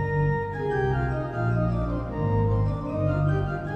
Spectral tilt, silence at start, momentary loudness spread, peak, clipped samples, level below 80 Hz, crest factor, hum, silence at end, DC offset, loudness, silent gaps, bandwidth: -10 dB/octave; 0 s; 4 LU; -12 dBFS; under 0.1%; -36 dBFS; 12 dB; none; 0 s; under 0.1%; -26 LUFS; none; 6.6 kHz